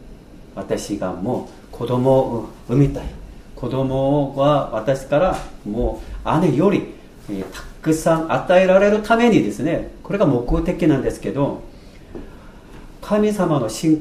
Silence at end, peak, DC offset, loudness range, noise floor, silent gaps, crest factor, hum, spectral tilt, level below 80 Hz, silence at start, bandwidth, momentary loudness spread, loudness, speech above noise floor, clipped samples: 0 s; -2 dBFS; under 0.1%; 5 LU; -40 dBFS; none; 16 dB; none; -7 dB/octave; -36 dBFS; 0 s; 15.5 kHz; 18 LU; -19 LUFS; 22 dB; under 0.1%